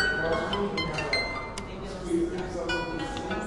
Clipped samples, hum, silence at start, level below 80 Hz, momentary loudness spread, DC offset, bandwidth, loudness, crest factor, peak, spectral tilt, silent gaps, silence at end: under 0.1%; none; 0 s; -44 dBFS; 9 LU; 0.1%; 11.5 kHz; -30 LUFS; 16 dB; -14 dBFS; -4.5 dB/octave; none; 0 s